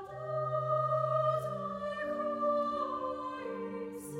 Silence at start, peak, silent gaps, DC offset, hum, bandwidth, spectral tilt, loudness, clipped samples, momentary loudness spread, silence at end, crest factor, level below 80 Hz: 0 s; -20 dBFS; none; under 0.1%; none; 16.5 kHz; -7 dB/octave; -34 LUFS; under 0.1%; 9 LU; 0 s; 14 dB; -68 dBFS